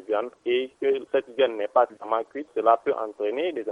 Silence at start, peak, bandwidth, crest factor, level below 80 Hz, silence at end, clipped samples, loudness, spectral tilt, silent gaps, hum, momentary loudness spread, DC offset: 0.1 s; -6 dBFS; 5.4 kHz; 20 dB; -78 dBFS; 0 s; under 0.1%; -25 LUFS; -5.5 dB/octave; none; none; 7 LU; under 0.1%